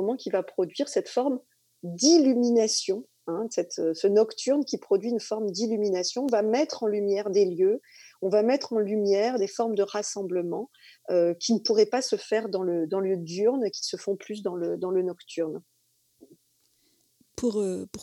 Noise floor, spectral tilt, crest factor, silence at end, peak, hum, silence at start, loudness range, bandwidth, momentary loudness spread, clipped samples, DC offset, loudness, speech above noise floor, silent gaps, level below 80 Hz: -68 dBFS; -4 dB/octave; 18 dB; 0 s; -8 dBFS; none; 0 s; 7 LU; 12 kHz; 10 LU; under 0.1%; under 0.1%; -26 LUFS; 43 dB; none; -74 dBFS